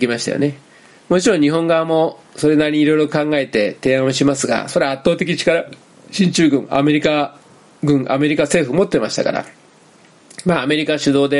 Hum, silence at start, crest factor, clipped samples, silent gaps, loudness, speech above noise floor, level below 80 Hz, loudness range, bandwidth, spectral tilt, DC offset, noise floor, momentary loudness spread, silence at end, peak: none; 0 s; 16 dB; under 0.1%; none; -16 LUFS; 32 dB; -52 dBFS; 2 LU; 11.5 kHz; -5 dB/octave; under 0.1%; -48 dBFS; 6 LU; 0 s; 0 dBFS